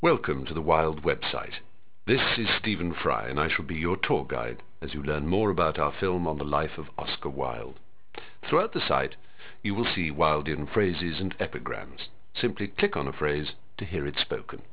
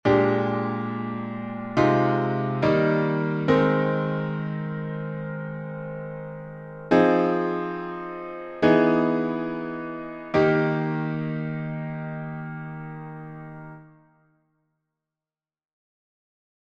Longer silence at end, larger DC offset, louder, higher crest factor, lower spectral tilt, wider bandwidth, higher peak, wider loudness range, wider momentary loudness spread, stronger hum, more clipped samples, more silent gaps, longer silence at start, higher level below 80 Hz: second, 0.1 s vs 2.9 s; first, 1% vs under 0.1%; second, -28 LUFS vs -25 LUFS; about the same, 22 dB vs 20 dB; about the same, -9.5 dB/octave vs -8.5 dB/octave; second, 4 kHz vs 7.2 kHz; about the same, -6 dBFS vs -6 dBFS; second, 3 LU vs 14 LU; second, 13 LU vs 16 LU; neither; neither; neither; about the same, 0 s vs 0.05 s; first, -46 dBFS vs -58 dBFS